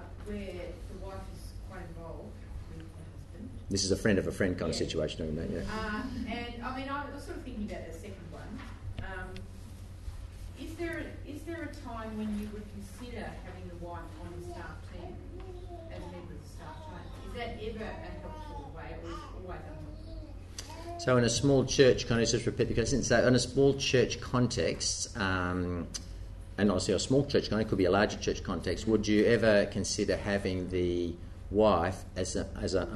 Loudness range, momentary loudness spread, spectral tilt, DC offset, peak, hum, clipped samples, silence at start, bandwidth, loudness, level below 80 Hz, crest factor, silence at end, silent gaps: 16 LU; 19 LU; -5 dB/octave; under 0.1%; -10 dBFS; none; under 0.1%; 0 s; 12 kHz; -31 LUFS; -46 dBFS; 22 dB; 0 s; none